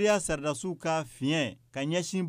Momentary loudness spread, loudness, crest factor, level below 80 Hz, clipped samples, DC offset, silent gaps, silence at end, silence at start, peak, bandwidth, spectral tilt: 6 LU; -31 LUFS; 16 dB; -56 dBFS; under 0.1%; under 0.1%; none; 0 s; 0 s; -14 dBFS; 15.5 kHz; -4.5 dB/octave